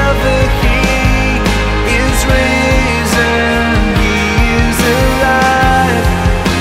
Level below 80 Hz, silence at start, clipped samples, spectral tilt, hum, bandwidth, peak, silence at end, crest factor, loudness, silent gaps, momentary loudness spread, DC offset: -16 dBFS; 0 s; under 0.1%; -5 dB/octave; none; 16.5 kHz; 0 dBFS; 0 s; 10 dB; -11 LUFS; none; 3 LU; under 0.1%